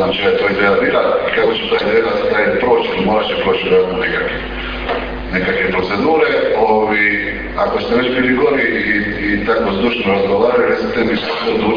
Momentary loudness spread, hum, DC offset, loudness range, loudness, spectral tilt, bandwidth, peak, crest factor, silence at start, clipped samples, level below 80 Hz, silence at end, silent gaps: 5 LU; none; under 0.1%; 2 LU; -15 LUFS; -7 dB/octave; 5.2 kHz; 0 dBFS; 14 dB; 0 s; under 0.1%; -34 dBFS; 0 s; none